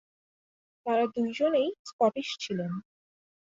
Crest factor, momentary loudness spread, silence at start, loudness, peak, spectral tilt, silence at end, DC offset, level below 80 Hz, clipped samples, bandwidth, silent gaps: 18 dB; 10 LU; 0.85 s; -29 LUFS; -12 dBFS; -5.5 dB/octave; 0.65 s; under 0.1%; -74 dBFS; under 0.1%; 7.8 kHz; 1.79-1.85 s, 1.93-1.99 s